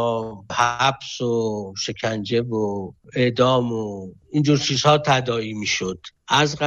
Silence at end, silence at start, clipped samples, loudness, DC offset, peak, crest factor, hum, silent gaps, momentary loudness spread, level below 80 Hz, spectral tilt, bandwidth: 0 s; 0 s; under 0.1%; -21 LUFS; under 0.1%; -4 dBFS; 16 dB; none; none; 11 LU; -54 dBFS; -4.5 dB/octave; 8.8 kHz